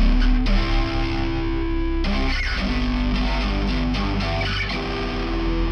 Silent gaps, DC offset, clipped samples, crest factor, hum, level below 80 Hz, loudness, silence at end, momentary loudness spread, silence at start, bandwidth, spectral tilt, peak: none; under 0.1%; under 0.1%; 12 dB; none; -22 dBFS; -23 LUFS; 0 s; 3 LU; 0 s; 6.6 kHz; -6.5 dB/octave; -8 dBFS